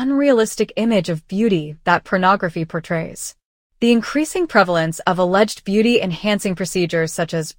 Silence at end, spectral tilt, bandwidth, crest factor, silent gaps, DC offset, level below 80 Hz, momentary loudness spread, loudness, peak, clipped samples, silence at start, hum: 0.05 s; -5 dB/octave; 17 kHz; 18 dB; 3.45-3.70 s; under 0.1%; -50 dBFS; 8 LU; -18 LUFS; 0 dBFS; under 0.1%; 0 s; none